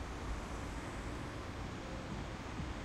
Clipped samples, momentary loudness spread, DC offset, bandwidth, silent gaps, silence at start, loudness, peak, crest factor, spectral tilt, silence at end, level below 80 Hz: under 0.1%; 1 LU; under 0.1%; 14 kHz; none; 0 s; -44 LUFS; -30 dBFS; 12 dB; -5.5 dB/octave; 0 s; -48 dBFS